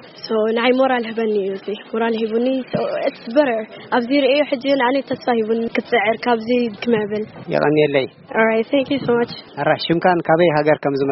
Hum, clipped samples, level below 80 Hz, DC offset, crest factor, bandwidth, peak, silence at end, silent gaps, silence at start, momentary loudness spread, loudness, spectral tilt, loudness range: none; under 0.1%; -60 dBFS; under 0.1%; 18 dB; 6 kHz; 0 dBFS; 0 s; none; 0 s; 7 LU; -18 LUFS; -3.5 dB/octave; 2 LU